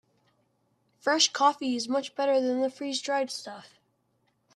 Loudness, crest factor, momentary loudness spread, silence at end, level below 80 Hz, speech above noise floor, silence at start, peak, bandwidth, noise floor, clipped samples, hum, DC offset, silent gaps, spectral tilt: -27 LUFS; 20 dB; 12 LU; 0.9 s; -82 dBFS; 45 dB; 1.05 s; -8 dBFS; 12.5 kHz; -73 dBFS; under 0.1%; none; under 0.1%; none; -1 dB/octave